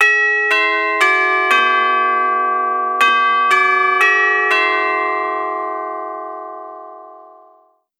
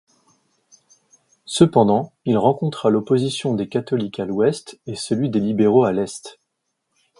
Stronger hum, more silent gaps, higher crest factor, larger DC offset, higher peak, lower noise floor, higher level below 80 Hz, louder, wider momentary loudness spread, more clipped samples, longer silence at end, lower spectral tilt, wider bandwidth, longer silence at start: neither; neither; about the same, 16 dB vs 20 dB; neither; about the same, 0 dBFS vs 0 dBFS; second, -53 dBFS vs -75 dBFS; second, under -90 dBFS vs -58 dBFS; first, -14 LUFS vs -19 LUFS; about the same, 15 LU vs 13 LU; neither; second, 0.75 s vs 0.9 s; second, 0 dB/octave vs -6.5 dB/octave; first, 14.5 kHz vs 11.5 kHz; second, 0 s vs 1.5 s